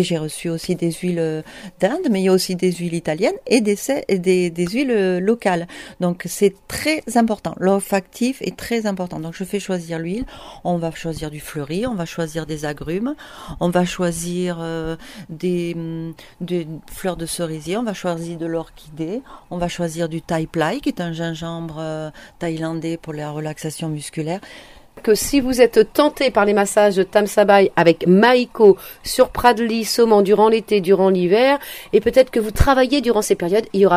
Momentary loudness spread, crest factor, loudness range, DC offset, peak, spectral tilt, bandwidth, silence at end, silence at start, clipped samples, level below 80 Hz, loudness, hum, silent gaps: 14 LU; 18 dB; 11 LU; under 0.1%; 0 dBFS; -5 dB/octave; 16 kHz; 0 s; 0 s; under 0.1%; -38 dBFS; -19 LUFS; none; none